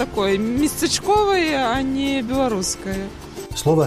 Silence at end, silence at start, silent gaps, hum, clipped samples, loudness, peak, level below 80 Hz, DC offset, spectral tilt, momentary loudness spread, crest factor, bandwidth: 0 s; 0 s; none; none; under 0.1%; -20 LUFS; -6 dBFS; -40 dBFS; under 0.1%; -4.5 dB/octave; 11 LU; 14 dB; 15.5 kHz